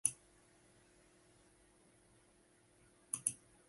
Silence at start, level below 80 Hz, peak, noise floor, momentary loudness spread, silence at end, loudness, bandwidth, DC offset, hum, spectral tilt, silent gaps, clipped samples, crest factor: 0.05 s; -80 dBFS; -12 dBFS; -70 dBFS; 28 LU; 0.35 s; -40 LUFS; 11.5 kHz; under 0.1%; none; -0.5 dB/octave; none; under 0.1%; 38 dB